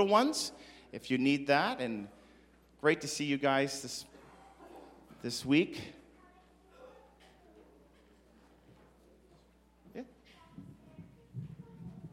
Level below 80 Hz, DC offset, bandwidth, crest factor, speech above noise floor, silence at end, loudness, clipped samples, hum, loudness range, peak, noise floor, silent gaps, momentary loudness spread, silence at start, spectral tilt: -68 dBFS; under 0.1%; 16 kHz; 24 dB; 33 dB; 0.05 s; -32 LUFS; under 0.1%; none; 23 LU; -12 dBFS; -65 dBFS; none; 25 LU; 0 s; -4 dB/octave